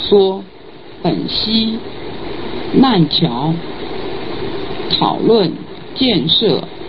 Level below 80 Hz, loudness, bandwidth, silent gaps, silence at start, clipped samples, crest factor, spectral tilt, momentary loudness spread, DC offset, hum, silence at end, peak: -42 dBFS; -15 LUFS; 5.8 kHz; none; 0 s; under 0.1%; 16 dB; -9.5 dB/octave; 15 LU; 2%; none; 0 s; 0 dBFS